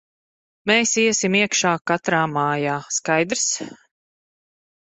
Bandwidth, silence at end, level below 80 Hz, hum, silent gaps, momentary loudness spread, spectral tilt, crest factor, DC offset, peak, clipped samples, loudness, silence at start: 8.4 kHz; 1.2 s; -64 dBFS; none; 1.81-1.85 s; 6 LU; -3 dB/octave; 20 dB; under 0.1%; -2 dBFS; under 0.1%; -20 LUFS; 0.65 s